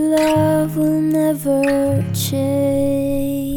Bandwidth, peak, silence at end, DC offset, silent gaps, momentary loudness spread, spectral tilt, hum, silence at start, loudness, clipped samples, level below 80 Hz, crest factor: 19.5 kHz; -4 dBFS; 0 s; under 0.1%; none; 4 LU; -6.5 dB/octave; none; 0 s; -17 LUFS; under 0.1%; -38 dBFS; 12 dB